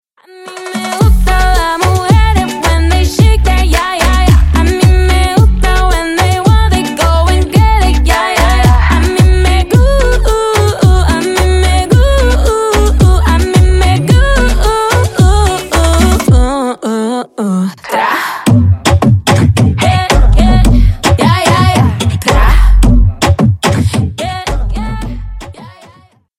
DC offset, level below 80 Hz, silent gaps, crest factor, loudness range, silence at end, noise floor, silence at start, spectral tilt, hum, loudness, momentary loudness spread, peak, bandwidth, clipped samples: under 0.1%; -12 dBFS; none; 8 dB; 2 LU; 0.7 s; -43 dBFS; 0.4 s; -5.5 dB/octave; none; -10 LUFS; 7 LU; 0 dBFS; 16 kHz; under 0.1%